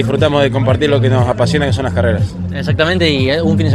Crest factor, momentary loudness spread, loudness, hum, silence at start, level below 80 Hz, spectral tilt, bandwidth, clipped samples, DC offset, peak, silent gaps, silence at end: 12 dB; 5 LU; -13 LUFS; none; 0 s; -36 dBFS; -6.5 dB/octave; 11.5 kHz; under 0.1%; under 0.1%; 0 dBFS; none; 0 s